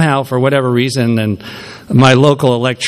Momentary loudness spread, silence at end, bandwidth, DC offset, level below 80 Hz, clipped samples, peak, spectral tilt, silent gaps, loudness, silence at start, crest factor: 14 LU; 0 s; 14 kHz; under 0.1%; -48 dBFS; 0.3%; 0 dBFS; -6 dB/octave; none; -12 LUFS; 0 s; 12 dB